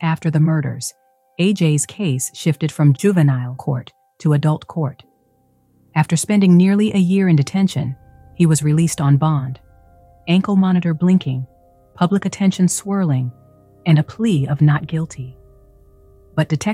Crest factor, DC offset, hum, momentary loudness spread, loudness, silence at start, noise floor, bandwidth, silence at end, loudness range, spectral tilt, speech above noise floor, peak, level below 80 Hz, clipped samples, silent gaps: 16 dB; under 0.1%; none; 12 LU; -17 LUFS; 0 s; -59 dBFS; 15 kHz; 0 s; 4 LU; -6.5 dB/octave; 43 dB; -2 dBFS; -54 dBFS; under 0.1%; none